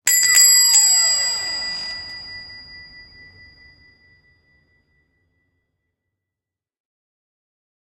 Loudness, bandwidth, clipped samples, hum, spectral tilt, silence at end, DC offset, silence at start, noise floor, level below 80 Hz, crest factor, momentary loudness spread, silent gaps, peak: -13 LUFS; 16 kHz; under 0.1%; none; 3.5 dB/octave; 5.15 s; under 0.1%; 0.05 s; -87 dBFS; -60 dBFS; 22 dB; 25 LU; none; 0 dBFS